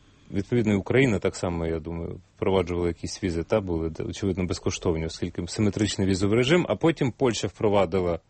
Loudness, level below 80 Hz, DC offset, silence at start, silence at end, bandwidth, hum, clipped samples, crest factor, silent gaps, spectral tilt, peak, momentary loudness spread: -26 LUFS; -46 dBFS; under 0.1%; 0.3 s; 0.1 s; 8.8 kHz; none; under 0.1%; 18 dB; none; -6 dB/octave; -8 dBFS; 10 LU